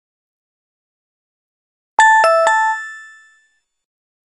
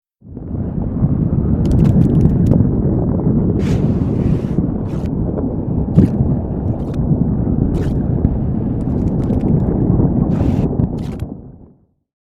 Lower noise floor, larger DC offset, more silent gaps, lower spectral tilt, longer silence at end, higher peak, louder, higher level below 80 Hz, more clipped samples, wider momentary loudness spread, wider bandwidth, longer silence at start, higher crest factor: first, -61 dBFS vs -48 dBFS; neither; neither; second, 1.5 dB/octave vs -11 dB/octave; first, 1.25 s vs 0.6 s; about the same, 0 dBFS vs 0 dBFS; first, -13 LUFS vs -16 LUFS; second, -76 dBFS vs -26 dBFS; neither; first, 14 LU vs 8 LU; first, 11.5 kHz vs 7.8 kHz; first, 2 s vs 0.25 s; about the same, 18 dB vs 16 dB